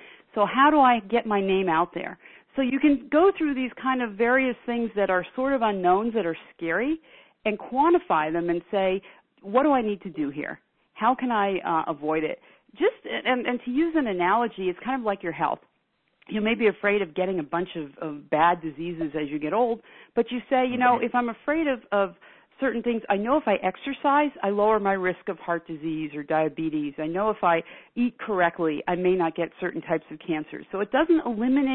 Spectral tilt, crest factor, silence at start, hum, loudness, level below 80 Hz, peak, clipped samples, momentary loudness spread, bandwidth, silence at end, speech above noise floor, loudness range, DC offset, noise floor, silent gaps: -10 dB/octave; 18 dB; 0 s; none; -25 LUFS; -58 dBFS; -6 dBFS; under 0.1%; 10 LU; 4.2 kHz; 0 s; 47 dB; 3 LU; under 0.1%; -72 dBFS; none